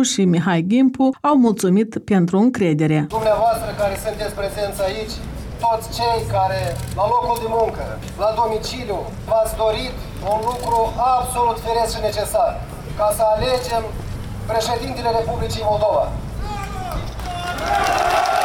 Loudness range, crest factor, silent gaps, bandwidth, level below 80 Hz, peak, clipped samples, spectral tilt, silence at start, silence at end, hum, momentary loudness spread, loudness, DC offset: 5 LU; 14 dB; none; 18 kHz; -34 dBFS; -6 dBFS; under 0.1%; -5.5 dB/octave; 0 s; 0 s; none; 11 LU; -20 LUFS; under 0.1%